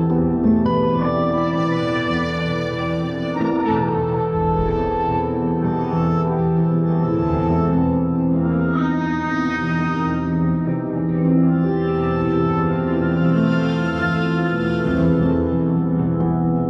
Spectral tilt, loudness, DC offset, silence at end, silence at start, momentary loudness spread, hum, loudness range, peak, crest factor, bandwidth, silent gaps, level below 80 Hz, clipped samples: -9 dB/octave; -19 LUFS; under 0.1%; 0 s; 0 s; 4 LU; none; 2 LU; -4 dBFS; 14 dB; 6.2 kHz; none; -38 dBFS; under 0.1%